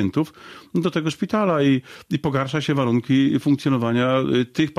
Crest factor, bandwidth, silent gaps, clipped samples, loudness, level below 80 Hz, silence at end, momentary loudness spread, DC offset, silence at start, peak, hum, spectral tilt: 14 dB; 13.5 kHz; none; under 0.1%; -21 LUFS; -56 dBFS; 0.05 s; 7 LU; under 0.1%; 0 s; -8 dBFS; none; -7 dB/octave